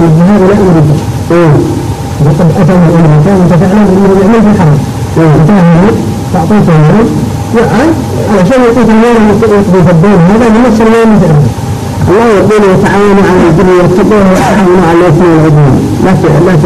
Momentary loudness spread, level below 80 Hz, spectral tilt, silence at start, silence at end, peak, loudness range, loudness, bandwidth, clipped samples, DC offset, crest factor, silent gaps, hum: 6 LU; -24 dBFS; -7.5 dB/octave; 0 s; 0 s; 0 dBFS; 2 LU; -5 LUFS; 13.5 kHz; under 0.1%; under 0.1%; 4 dB; none; none